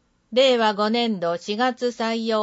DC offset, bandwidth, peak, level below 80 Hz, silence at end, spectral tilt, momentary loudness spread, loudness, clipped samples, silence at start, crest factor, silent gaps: under 0.1%; 8 kHz; -8 dBFS; -70 dBFS; 0 s; -4.5 dB/octave; 8 LU; -22 LUFS; under 0.1%; 0.3 s; 14 dB; none